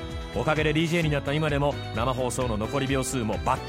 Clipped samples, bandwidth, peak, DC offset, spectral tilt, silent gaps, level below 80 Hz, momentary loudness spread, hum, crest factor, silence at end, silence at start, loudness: under 0.1%; 16 kHz; -10 dBFS; under 0.1%; -5.5 dB/octave; none; -40 dBFS; 4 LU; none; 16 dB; 0 s; 0 s; -26 LUFS